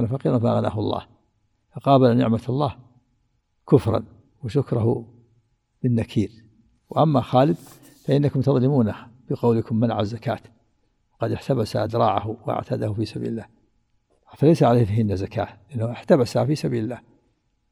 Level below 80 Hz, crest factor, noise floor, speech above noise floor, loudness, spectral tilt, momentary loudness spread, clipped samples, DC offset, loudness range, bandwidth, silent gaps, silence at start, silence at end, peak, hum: -54 dBFS; 20 dB; -68 dBFS; 47 dB; -22 LUFS; -8.5 dB/octave; 12 LU; under 0.1%; under 0.1%; 4 LU; 12.5 kHz; none; 0 s; 0.7 s; -2 dBFS; none